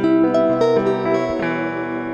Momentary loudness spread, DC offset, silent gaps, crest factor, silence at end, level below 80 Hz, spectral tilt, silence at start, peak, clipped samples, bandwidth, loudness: 7 LU; under 0.1%; none; 12 dB; 0 s; -52 dBFS; -7 dB/octave; 0 s; -4 dBFS; under 0.1%; 7.6 kHz; -18 LUFS